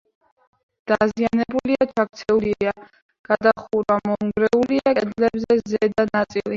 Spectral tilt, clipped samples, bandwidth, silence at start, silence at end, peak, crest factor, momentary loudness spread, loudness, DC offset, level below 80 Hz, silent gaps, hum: -6.5 dB/octave; under 0.1%; 7.4 kHz; 0.85 s; 0 s; -2 dBFS; 18 dB; 5 LU; -21 LUFS; under 0.1%; -54 dBFS; 3.02-3.09 s, 3.19-3.24 s; none